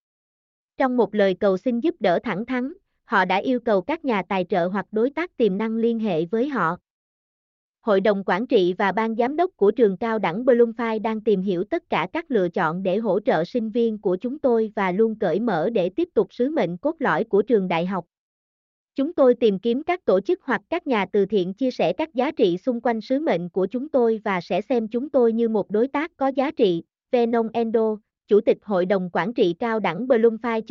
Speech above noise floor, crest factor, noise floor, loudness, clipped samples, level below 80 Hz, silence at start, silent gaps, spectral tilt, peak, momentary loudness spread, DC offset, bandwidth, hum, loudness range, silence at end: over 68 dB; 16 dB; under -90 dBFS; -22 LUFS; under 0.1%; -64 dBFS; 0.8 s; 6.90-7.74 s, 18.18-18.88 s; -8 dB/octave; -6 dBFS; 6 LU; under 0.1%; 6.6 kHz; none; 2 LU; 0.1 s